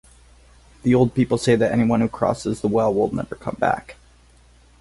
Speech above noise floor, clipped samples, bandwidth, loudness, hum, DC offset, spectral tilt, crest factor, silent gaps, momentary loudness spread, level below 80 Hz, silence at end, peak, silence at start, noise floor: 32 dB; under 0.1%; 11.5 kHz; -21 LUFS; none; under 0.1%; -7 dB/octave; 18 dB; none; 8 LU; -48 dBFS; 0.9 s; -4 dBFS; 0.85 s; -52 dBFS